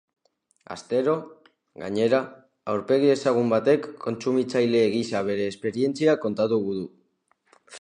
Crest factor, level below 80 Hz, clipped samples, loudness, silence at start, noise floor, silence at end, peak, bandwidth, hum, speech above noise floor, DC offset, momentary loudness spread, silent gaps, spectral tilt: 18 dB; -68 dBFS; under 0.1%; -24 LUFS; 0.7 s; -68 dBFS; 0 s; -6 dBFS; 10.5 kHz; none; 45 dB; under 0.1%; 12 LU; none; -6 dB/octave